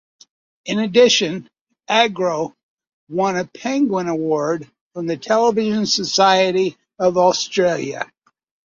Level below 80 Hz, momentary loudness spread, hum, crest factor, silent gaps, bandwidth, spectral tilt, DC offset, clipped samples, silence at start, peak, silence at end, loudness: -62 dBFS; 14 LU; none; 18 dB; 1.61-1.66 s, 2.63-2.77 s, 2.93-3.07 s, 4.81-4.91 s; 7.6 kHz; -3.5 dB/octave; under 0.1%; under 0.1%; 0.65 s; -2 dBFS; 0.7 s; -18 LUFS